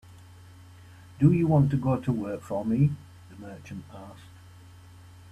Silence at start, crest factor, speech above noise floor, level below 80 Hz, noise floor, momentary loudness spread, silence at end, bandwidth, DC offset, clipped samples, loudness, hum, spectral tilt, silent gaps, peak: 1.2 s; 20 dB; 24 dB; -56 dBFS; -50 dBFS; 23 LU; 1.05 s; 9 kHz; under 0.1%; under 0.1%; -25 LUFS; none; -9.5 dB/octave; none; -8 dBFS